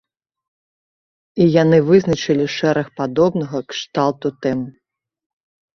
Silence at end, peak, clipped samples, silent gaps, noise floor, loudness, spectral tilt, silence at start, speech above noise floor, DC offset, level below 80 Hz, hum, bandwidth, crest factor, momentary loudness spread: 1.05 s; -2 dBFS; under 0.1%; none; under -90 dBFS; -17 LUFS; -6.5 dB/octave; 1.35 s; over 74 dB; under 0.1%; -54 dBFS; none; 7.2 kHz; 16 dB; 12 LU